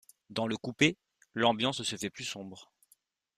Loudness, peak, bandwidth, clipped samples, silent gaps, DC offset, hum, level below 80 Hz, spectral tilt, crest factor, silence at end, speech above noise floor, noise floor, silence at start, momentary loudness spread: -31 LUFS; -10 dBFS; 15 kHz; under 0.1%; none; under 0.1%; none; -70 dBFS; -4 dB/octave; 24 dB; 0.75 s; 38 dB; -70 dBFS; 0.3 s; 18 LU